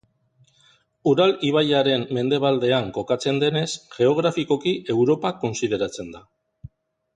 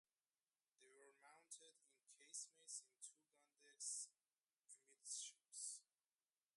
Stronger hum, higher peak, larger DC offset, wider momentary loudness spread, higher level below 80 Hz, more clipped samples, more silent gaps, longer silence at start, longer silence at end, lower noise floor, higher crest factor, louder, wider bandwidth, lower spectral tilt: neither; first, -8 dBFS vs -38 dBFS; neither; second, 7 LU vs 17 LU; first, -58 dBFS vs under -90 dBFS; neither; neither; first, 1.05 s vs 0.8 s; second, 0.5 s vs 0.75 s; second, -61 dBFS vs under -90 dBFS; second, 16 dB vs 22 dB; first, -21 LUFS vs -54 LUFS; second, 9.6 kHz vs 11.5 kHz; first, -5.5 dB/octave vs 3.5 dB/octave